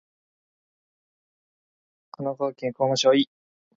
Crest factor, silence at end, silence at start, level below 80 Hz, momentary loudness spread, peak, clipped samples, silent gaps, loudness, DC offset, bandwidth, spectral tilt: 20 dB; 0.55 s; 2.2 s; -72 dBFS; 12 LU; -8 dBFS; under 0.1%; none; -24 LUFS; under 0.1%; 7.8 kHz; -4.5 dB/octave